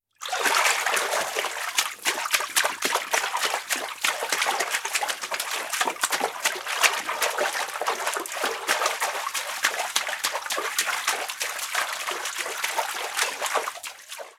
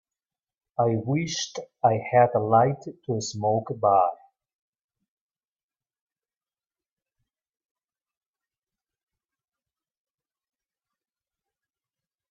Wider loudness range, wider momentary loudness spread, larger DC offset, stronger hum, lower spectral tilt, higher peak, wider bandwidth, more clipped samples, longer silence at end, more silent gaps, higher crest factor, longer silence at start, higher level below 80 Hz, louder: second, 3 LU vs 6 LU; second, 6 LU vs 10 LU; neither; neither; second, 2 dB/octave vs -5.5 dB/octave; first, 0 dBFS vs -6 dBFS; first, 19 kHz vs 7.8 kHz; neither; second, 0.05 s vs 8.15 s; neither; about the same, 26 dB vs 22 dB; second, 0.2 s vs 0.8 s; second, -84 dBFS vs -70 dBFS; about the same, -25 LUFS vs -24 LUFS